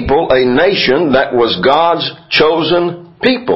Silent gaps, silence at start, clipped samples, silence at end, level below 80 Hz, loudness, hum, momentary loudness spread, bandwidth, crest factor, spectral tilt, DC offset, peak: none; 0 s; under 0.1%; 0 s; -38 dBFS; -12 LUFS; none; 4 LU; 7.4 kHz; 12 dB; -7 dB/octave; under 0.1%; 0 dBFS